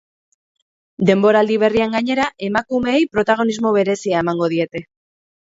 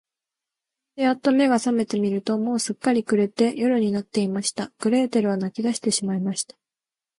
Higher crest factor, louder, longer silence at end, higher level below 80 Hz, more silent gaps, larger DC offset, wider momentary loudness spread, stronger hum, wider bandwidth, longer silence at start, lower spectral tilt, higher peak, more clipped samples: about the same, 18 dB vs 16 dB; first, -17 LUFS vs -23 LUFS; about the same, 0.65 s vs 0.75 s; first, -54 dBFS vs -68 dBFS; neither; neither; about the same, 6 LU vs 6 LU; neither; second, 7.8 kHz vs 11.5 kHz; about the same, 1 s vs 0.95 s; first, -6 dB/octave vs -4.5 dB/octave; first, 0 dBFS vs -8 dBFS; neither